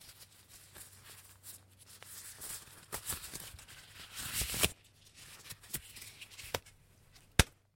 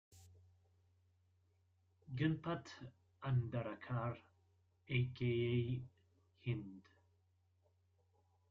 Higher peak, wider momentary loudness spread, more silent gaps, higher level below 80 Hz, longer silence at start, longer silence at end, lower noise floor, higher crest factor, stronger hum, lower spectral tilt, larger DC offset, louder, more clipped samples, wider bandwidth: first, -2 dBFS vs -24 dBFS; first, 22 LU vs 17 LU; neither; first, -52 dBFS vs -72 dBFS; about the same, 0 s vs 0.1 s; second, 0.25 s vs 1.7 s; second, -63 dBFS vs -77 dBFS; first, 40 dB vs 20 dB; neither; second, -2.5 dB/octave vs -6.5 dB/octave; neither; first, -38 LUFS vs -42 LUFS; neither; first, 17 kHz vs 7.4 kHz